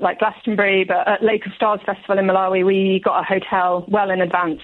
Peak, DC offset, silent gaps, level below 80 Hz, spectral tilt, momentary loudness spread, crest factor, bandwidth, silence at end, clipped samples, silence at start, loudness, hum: -4 dBFS; under 0.1%; none; -60 dBFS; -8.5 dB/octave; 3 LU; 14 dB; 4.2 kHz; 0 s; under 0.1%; 0 s; -18 LUFS; none